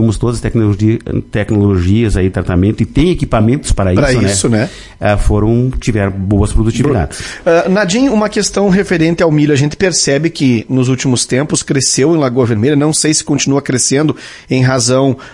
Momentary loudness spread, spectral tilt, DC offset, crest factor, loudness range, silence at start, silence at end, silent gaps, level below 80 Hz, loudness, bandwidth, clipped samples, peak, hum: 4 LU; -5 dB/octave; under 0.1%; 12 dB; 1 LU; 0 s; 0.05 s; none; -24 dBFS; -12 LUFS; 11.5 kHz; under 0.1%; 0 dBFS; none